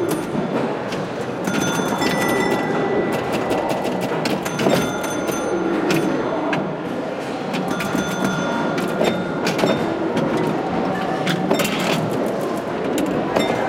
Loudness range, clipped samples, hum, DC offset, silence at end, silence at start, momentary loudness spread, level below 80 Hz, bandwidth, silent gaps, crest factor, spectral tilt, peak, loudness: 2 LU; under 0.1%; none; under 0.1%; 0 s; 0 s; 5 LU; -52 dBFS; 17 kHz; none; 18 dB; -5 dB/octave; -4 dBFS; -21 LUFS